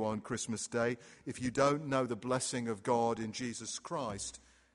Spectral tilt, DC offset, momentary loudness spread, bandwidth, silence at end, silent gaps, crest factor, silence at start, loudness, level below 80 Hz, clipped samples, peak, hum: -4.5 dB/octave; under 0.1%; 10 LU; 11.5 kHz; 0.35 s; none; 22 dB; 0 s; -35 LUFS; -66 dBFS; under 0.1%; -14 dBFS; none